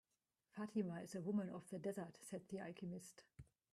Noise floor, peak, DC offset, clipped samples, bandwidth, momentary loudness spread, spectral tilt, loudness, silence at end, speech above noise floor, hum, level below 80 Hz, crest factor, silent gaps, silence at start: under -90 dBFS; -30 dBFS; under 0.1%; under 0.1%; 14 kHz; 16 LU; -6.5 dB/octave; -48 LUFS; 0.3 s; over 42 dB; none; -80 dBFS; 18 dB; none; 0.55 s